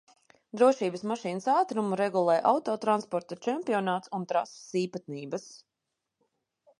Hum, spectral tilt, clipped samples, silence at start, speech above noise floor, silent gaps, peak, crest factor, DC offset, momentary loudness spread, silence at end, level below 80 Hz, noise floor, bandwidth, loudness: none; -5.5 dB/octave; under 0.1%; 0.55 s; 57 dB; none; -10 dBFS; 20 dB; under 0.1%; 12 LU; 1.25 s; -82 dBFS; -85 dBFS; 11.5 kHz; -29 LUFS